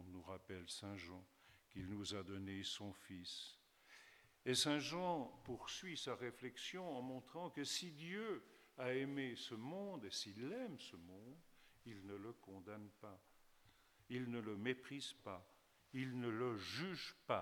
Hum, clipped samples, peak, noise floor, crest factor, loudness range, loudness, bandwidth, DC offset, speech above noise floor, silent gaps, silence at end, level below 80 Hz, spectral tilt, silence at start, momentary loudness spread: none; under 0.1%; -24 dBFS; -72 dBFS; 24 dB; 8 LU; -47 LUFS; 19 kHz; under 0.1%; 25 dB; none; 0 s; -80 dBFS; -4 dB/octave; 0 s; 16 LU